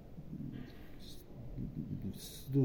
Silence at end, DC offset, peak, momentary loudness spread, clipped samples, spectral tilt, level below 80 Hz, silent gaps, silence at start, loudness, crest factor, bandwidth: 0 s; under 0.1%; -22 dBFS; 10 LU; under 0.1%; -7.5 dB/octave; -54 dBFS; none; 0 s; -45 LUFS; 18 dB; over 20 kHz